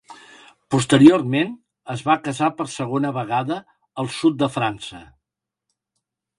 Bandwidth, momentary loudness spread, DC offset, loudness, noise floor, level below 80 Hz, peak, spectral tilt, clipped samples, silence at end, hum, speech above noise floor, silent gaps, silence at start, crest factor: 11.5 kHz; 19 LU; under 0.1%; -20 LUFS; -84 dBFS; -58 dBFS; 0 dBFS; -5.5 dB/octave; under 0.1%; 1.35 s; none; 65 dB; none; 0.1 s; 22 dB